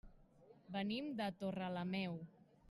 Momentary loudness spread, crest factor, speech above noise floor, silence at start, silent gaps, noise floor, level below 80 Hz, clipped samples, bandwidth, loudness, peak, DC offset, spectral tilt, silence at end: 7 LU; 16 dB; 23 dB; 0.05 s; none; -66 dBFS; -72 dBFS; under 0.1%; 12 kHz; -44 LUFS; -28 dBFS; under 0.1%; -7 dB/octave; 0.05 s